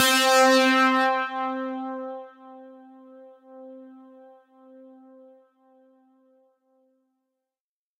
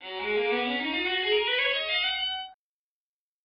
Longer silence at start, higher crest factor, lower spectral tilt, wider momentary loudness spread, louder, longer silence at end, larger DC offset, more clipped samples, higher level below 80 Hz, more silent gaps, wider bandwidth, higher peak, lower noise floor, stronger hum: about the same, 0 s vs 0 s; about the same, 18 dB vs 14 dB; first, 0 dB/octave vs 2 dB/octave; first, 28 LU vs 6 LU; first, -21 LUFS vs -26 LUFS; first, 4.1 s vs 0.9 s; neither; neither; second, -80 dBFS vs -64 dBFS; neither; first, 16 kHz vs 5.4 kHz; first, -8 dBFS vs -14 dBFS; about the same, under -90 dBFS vs under -90 dBFS; neither